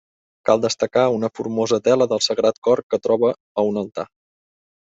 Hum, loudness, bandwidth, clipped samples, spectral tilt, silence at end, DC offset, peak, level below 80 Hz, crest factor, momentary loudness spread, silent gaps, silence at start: none; -20 LUFS; 8.2 kHz; under 0.1%; -4.5 dB/octave; 0.9 s; under 0.1%; -2 dBFS; -62 dBFS; 18 dB; 9 LU; 2.58-2.62 s, 2.83-2.90 s, 3.40-3.55 s; 0.45 s